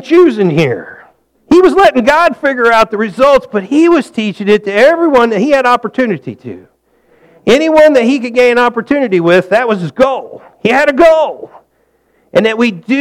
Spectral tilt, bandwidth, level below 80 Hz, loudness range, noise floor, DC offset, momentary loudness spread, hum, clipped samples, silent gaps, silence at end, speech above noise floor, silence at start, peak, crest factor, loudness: -6 dB/octave; 14 kHz; -44 dBFS; 3 LU; -56 dBFS; under 0.1%; 9 LU; none; under 0.1%; none; 0 s; 47 dB; 0 s; 0 dBFS; 10 dB; -10 LUFS